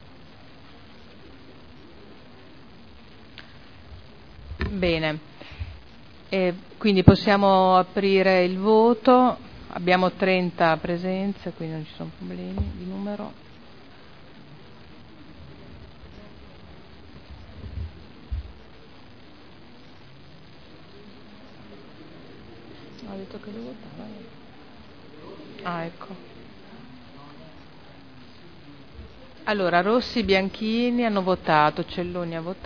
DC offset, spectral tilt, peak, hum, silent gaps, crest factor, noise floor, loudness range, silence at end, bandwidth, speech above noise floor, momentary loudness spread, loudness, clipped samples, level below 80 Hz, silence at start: 0.4%; -8 dB/octave; 0 dBFS; none; none; 26 dB; -48 dBFS; 24 LU; 0 s; 5.4 kHz; 26 dB; 28 LU; -23 LUFS; under 0.1%; -46 dBFS; 1.3 s